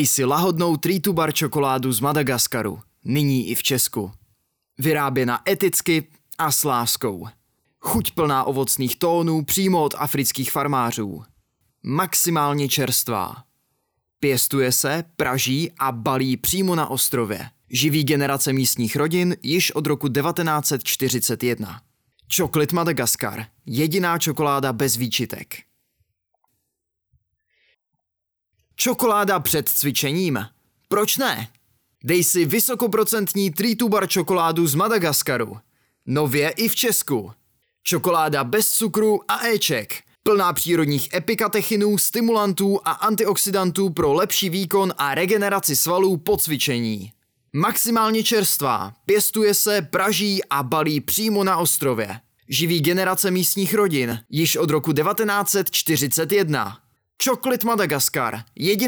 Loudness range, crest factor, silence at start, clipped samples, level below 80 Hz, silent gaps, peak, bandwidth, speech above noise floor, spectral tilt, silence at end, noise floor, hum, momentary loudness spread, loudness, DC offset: 3 LU; 14 dB; 0 s; under 0.1%; -56 dBFS; none; -8 dBFS; over 20 kHz; 61 dB; -3.5 dB/octave; 0 s; -82 dBFS; none; 7 LU; -20 LUFS; under 0.1%